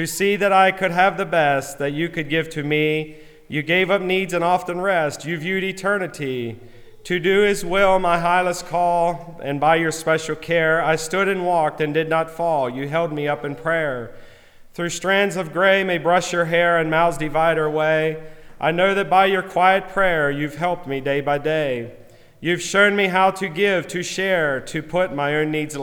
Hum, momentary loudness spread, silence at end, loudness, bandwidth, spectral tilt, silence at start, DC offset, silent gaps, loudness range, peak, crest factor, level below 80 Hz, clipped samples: none; 9 LU; 0 s; -20 LUFS; 19 kHz; -4.5 dB/octave; 0 s; under 0.1%; none; 3 LU; -2 dBFS; 18 dB; -46 dBFS; under 0.1%